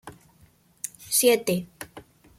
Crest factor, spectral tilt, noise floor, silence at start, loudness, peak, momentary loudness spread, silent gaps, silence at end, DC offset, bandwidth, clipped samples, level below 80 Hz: 20 dB; -3 dB/octave; -59 dBFS; 0.05 s; -22 LUFS; -8 dBFS; 22 LU; none; 0.4 s; under 0.1%; 16.5 kHz; under 0.1%; -64 dBFS